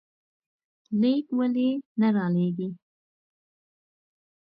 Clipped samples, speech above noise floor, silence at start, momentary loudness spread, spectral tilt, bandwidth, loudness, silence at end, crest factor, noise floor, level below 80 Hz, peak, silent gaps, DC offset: under 0.1%; over 66 dB; 0.9 s; 8 LU; -11 dB/octave; 5.2 kHz; -26 LUFS; 1.65 s; 16 dB; under -90 dBFS; -76 dBFS; -12 dBFS; 1.86-1.96 s; under 0.1%